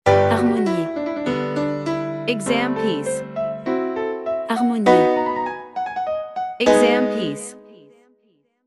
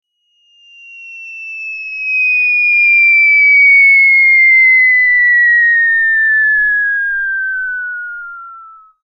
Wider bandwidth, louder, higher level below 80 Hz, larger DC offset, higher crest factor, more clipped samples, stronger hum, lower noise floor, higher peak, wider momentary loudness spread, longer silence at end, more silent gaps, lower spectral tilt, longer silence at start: first, 12 kHz vs 6 kHz; second, -20 LUFS vs -7 LUFS; about the same, -56 dBFS vs -52 dBFS; second, under 0.1% vs 0.3%; first, 20 dB vs 8 dB; neither; neither; first, -63 dBFS vs -56 dBFS; about the same, 0 dBFS vs -2 dBFS; second, 11 LU vs 18 LU; first, 0.9 s vs 0.4 s; neither; first, -5.5 dB/octave vs 2 dB/octave; second, 0.05 s vs 0.9 s